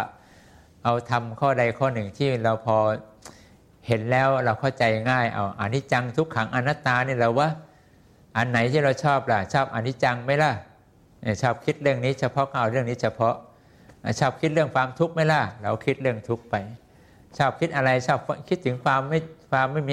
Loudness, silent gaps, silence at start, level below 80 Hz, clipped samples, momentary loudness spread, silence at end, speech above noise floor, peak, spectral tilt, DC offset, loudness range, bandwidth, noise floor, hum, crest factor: -24 LUFS; none; 0 s; -58 dBFS; under 0.1%; 7 LU; 0 s; 32 dB; -6 dBFS; -6.5 dB/octave; under 0.1%; 2 LU; 11.5 kHz; -55 dBFS; none; 18 dB